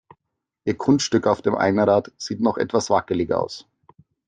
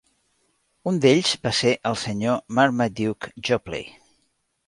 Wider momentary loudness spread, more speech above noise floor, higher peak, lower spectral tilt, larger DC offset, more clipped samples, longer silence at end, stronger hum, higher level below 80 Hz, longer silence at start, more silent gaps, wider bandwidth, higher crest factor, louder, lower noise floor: about the same, 11 LU vs 13 LU; first, 60 dB vs 48 dB; about the same, -4 dBFS vs -4 dBFS; about the same, -5.5 dB/octave vs -4.5 dB/octave; neither; neither; about the same, 0.65 s vs 0.75 s; neither; about the same, -60 dBFS vs -56 dBFS; second, 0.65 s vs 0.85 s; neither; second, 9.6 kHz vs 11.5 kHz; about the same, 18 dB vs 20 dB; about the same, -21 LUFS vs -22 LUFS; first, -81 dBFS vs -70 dBFS